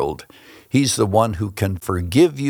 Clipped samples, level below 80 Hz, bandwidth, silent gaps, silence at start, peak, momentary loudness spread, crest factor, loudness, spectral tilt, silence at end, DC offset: under 0.1%; -48 dBFS; over 20 kHz; none; 0 s; -2 dBFS; 8 LU; 18 dB; -19 LUFS; -5.5 dB/octave; 0 s; under 0.1%